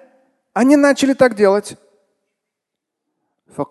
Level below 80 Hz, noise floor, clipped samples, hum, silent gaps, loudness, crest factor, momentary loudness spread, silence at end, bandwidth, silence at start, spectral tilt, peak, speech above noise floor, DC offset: -60 dBFS; -81 dBFS; under 0.1%; none; none; -14 LUFS; 18 dB; 19 LU; 0.05 s; 12.5 kHz; 0.55 s; -5 dB/octave; 0 dBFS; 68 dB; under 0.1%